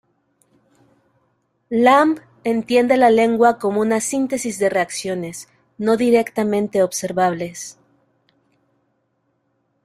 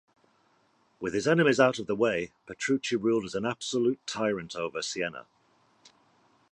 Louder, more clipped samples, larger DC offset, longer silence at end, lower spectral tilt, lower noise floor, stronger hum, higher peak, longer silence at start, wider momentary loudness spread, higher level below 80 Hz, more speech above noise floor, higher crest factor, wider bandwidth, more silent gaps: first, -18 LUFS vs -28 LUFS; neither; neither; first, 2.15 s vs 1.3 s; about the same, -4.5 dB/octave vs -4.5 dB/octave; about the same, -68 dBFS vs -68 dBFS; neither; first, -2 dBFS vs -8 dBFS; first, 1.7 s vs 1 s; about the same, 13 LU vs 11 LU; about the same, -62 dBFS vs -66 dBFS; first, 51 dB vs 40 dB; about the same, 18 dB vs 22 dB; first, 15 kHz vs 11 kHz; neither